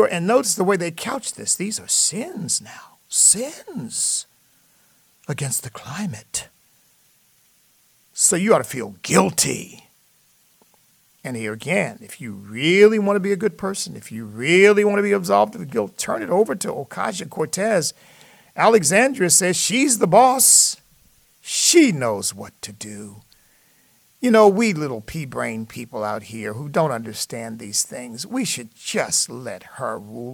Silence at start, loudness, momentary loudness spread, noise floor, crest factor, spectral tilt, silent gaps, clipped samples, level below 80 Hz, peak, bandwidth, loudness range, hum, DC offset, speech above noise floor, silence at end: 0 s; -19 LUFS; 18 LU; -59 dBFS; 20 dB; -3 dB/octave; none; under 0.1%; -62 dBFS; -2 dBFS; 19 kHz; 10 LU; none; under 0.1%; 39 dB; 0 s